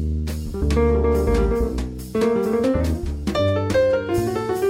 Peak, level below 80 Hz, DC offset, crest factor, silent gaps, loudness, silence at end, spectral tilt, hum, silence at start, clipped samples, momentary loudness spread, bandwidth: -8 dBFS; -26 dBFS; under 0.1%; 12 dB; none; -21 LUFS; 0 s; -7 dB/octave; none; 0 s; under 0.1%; 7 LU; 16 kHz